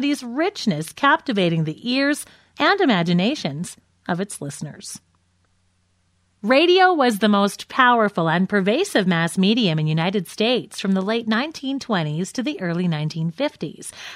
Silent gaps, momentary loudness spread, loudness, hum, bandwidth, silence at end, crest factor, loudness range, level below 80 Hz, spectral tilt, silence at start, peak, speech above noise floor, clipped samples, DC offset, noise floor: none; 15 LU; -20 LUFS; none; 15.5 kHz; 0 s; 20 dB; 6 LU; -66 dBFS; -5 dB/octave; 0 s; -2 dBFS; 44 dB; under 0.1%; under 0.1%; -64 dBFS